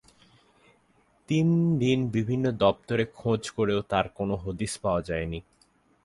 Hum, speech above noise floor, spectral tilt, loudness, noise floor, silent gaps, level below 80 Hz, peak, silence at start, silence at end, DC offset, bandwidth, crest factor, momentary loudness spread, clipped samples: none; 39 dB; -6.5 dB/octave; -27 LUFS; -65 dBFS; none; -50 dBFS; -8 dBFS; 1.3 s; 0.65 s; under 0.1%; 11.5 kHz; 20 dB; 8 LU; under 0.1%